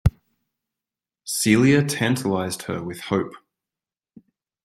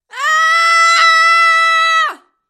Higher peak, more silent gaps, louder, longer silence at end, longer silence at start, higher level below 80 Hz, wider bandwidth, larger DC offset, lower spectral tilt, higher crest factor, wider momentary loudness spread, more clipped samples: second, -4 dBFS vs 0 dBFS; neither; second, -22 LUFS vs -9 LUFS; first, 1.25 s vs 0.35 s; about the same, 0.05 s vs 0.15 s; first, -42 dBFS vs -80 dBFS; about the same, 15.5 kHz vs 15.5 kHz; neither; first, -5 dB/octave vs 5 dB/octave; first, 20 dB vs 12 dB; first, 13 LU vs 7 LU; neither